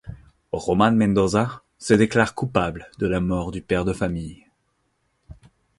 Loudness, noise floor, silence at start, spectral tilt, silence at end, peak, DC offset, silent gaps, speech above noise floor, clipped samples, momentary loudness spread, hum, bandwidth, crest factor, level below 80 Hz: -22 LUFS; -70 dBFS; 0.05 s; -6.5 dB/octave; 0.45 s; -2 dBFS; under 0.1%; none; 49 dB; under 0.1%; 14 LU; none; 11.5 kHz; 20 dB; -44 dBFS